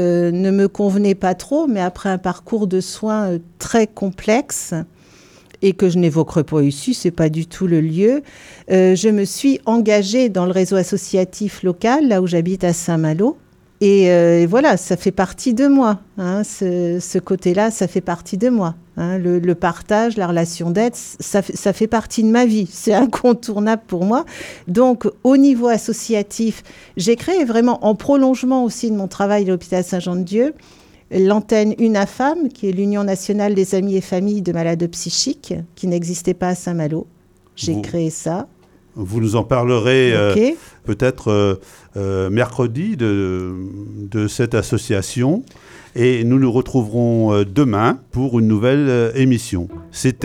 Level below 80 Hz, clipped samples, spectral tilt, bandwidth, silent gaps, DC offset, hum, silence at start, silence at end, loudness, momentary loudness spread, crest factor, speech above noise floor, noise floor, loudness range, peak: -48 dBFS; under 0.1%; -6 dB/octave; 16 kHz; none; under 0.1%; none; 0 s; 0 s; -17 LUFS; 9 LU; 16 dB; 30 dB; -47 dBFS; 5 LU; -2 dBFS